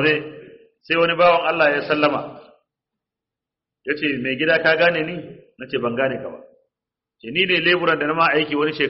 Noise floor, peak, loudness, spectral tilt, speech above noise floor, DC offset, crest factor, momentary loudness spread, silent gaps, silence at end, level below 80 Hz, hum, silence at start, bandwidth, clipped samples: -87 dBFS; -4 dBFS; -19 LUFS; -2 dB/octave; 67 dB; under 0.1%; 16 dB; 18 LU; none; 0 s; -62 dBFS; none; 0 s; 5.8 kHz; under 0.1%